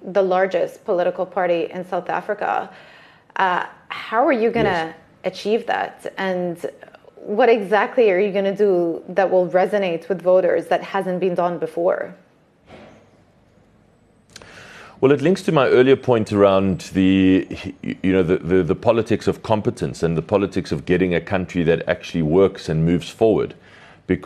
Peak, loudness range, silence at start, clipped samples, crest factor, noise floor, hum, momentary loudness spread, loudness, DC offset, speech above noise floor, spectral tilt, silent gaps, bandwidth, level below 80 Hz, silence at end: -2 dBFS; 6 LU; 0 s; under 0.1%; 18 dB; -55 dBFS; none; 11 LU; -19 LUFS; under 0.1%; 36 dB; -7 dB/octave; none; 12.5 kHz; -50 dBFS; 0 s